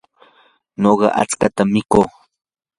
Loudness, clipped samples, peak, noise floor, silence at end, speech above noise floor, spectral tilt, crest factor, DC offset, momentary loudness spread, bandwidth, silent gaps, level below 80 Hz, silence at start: -16 LUFS; under 0.1%; 0 dBFS; -55 dBFS; 0.7 s; 40 dB; -5.5 dB/octave; 18 dB; under 0.1%; 6 LU; 11.5 kHz; none; -48 dBFS; 0.8 s